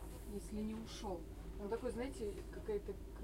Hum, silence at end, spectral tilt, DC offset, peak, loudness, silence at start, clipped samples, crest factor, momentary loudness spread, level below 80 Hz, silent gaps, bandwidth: none; 0 s; -6 dB/octave; under 0.1%; -30 dBFS; -46 LUFS; 0 s; under 0.1%; 14 dB; 6 LU; -52 dBFS; none; 16 kHz